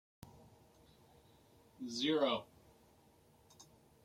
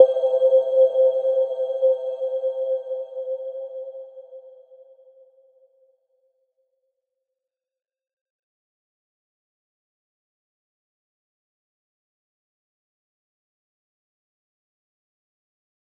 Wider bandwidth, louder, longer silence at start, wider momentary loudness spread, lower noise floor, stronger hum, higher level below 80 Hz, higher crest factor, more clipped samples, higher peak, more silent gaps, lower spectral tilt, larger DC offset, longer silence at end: first, 16 kHz vs 3.5 kHz; second, -37 LUFS vs -21 LUFS; first, 0.25 s vs 0 s; first, 28 LU vs 19 LU; second, -68 dBFS vs -86 dBFS; neither; first, -76 dBFS vs under -90 dBFS; about the same, 22 dB vs 26 dB; neither; second, -22 dBFS vs -2 dBFS; neither; about the same, -4 dB/octave vs -3.5 dB/octave; neither; second, 0.4 s vs 11.5 s